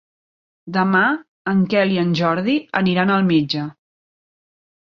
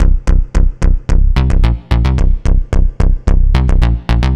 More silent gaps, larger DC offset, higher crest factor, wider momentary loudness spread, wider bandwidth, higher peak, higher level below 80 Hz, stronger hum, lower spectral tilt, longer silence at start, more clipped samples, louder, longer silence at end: first, 1.28-1.45 s vs none; neither; first, 18 dB vs 10 dB; first, 9 LU vs 3 LU; second, 6.4 kHz vs 7.6 kHz; about the same, -2 dBFS vs 0 dBFS; second, -60 dBFS vs -10 dBFS; neither; about the same, -7.5 dB/octave vs -7.5 dB/octave; first, 0.65 s vs 0 s; second, under 0.1% vs 0.6%; second, -18 LUFS vs -15 LUFS; first, 1.15 s vs 0 s